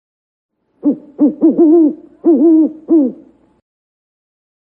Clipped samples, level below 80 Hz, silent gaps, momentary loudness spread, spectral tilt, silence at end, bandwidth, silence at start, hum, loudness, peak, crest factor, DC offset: under 0.1%; -66 dBFS; none; 9 LU; -12.5 dB/octave; 1.65 s; 1.5 kHz; 0.85 s; none; -12 LUFS; 0 dBFS; 14 dB; under 0.1%